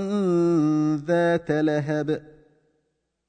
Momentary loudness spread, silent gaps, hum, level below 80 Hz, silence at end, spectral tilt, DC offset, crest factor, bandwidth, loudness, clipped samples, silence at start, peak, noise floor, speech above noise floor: 6 LU; none; none; -62 dBFS; 1.1 s; -8 dB/octave; under 0.1%; 14 dB; 9 kHz; -23 LUFS; under 0.1%; 0 s; -10 dBFS; -75 dBFS; 52 dB